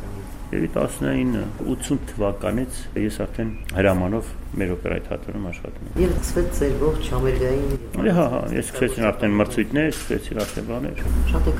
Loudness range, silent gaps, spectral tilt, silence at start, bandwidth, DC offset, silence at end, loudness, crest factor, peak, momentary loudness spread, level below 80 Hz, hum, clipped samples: 3 LU; none; -6 dB/octave; 0 s; 16 kHz; under 0.1%; 0 s; -24 LUFS; 18 dB; -4 dBFS; 9 LU; -28 dBFS; none; under 0.1%